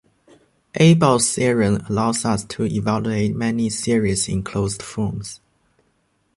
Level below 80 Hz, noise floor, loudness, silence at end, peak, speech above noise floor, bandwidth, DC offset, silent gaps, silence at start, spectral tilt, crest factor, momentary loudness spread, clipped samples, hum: -46 dBFS; -66 dBFS; -19 LUFS; 1 s; -2 dBFS; 47 dB; 11.5 kHz; under 0.1%; none; 0.75 s; -5 dB/octave; 20 dB; 11 LU; under 0.1%; none